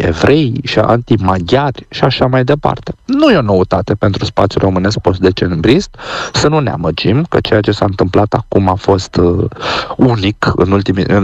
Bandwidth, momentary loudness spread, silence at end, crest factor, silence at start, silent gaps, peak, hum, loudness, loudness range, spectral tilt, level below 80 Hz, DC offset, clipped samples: 8.4 kHz; 5 LU; 0 s; 12 dB; 0 s; none; 0 dBFS; none; -12 LUFS; 1 LU; -6.5 dB/octave; -34 dBFS; under 0.1%; under 0.1%